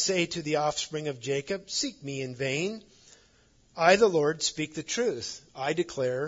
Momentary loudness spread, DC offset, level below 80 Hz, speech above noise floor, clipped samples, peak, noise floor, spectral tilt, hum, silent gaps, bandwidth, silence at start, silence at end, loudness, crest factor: 13 LU; under 0.1%; -64 dBFS; 34 dB; under 0.1%; -8 dBFS; -62 dBFS; -3.5 dB/octave; none; none; 7.8 kHz; 0 s; 0 s; -28 LUFS; 22 dB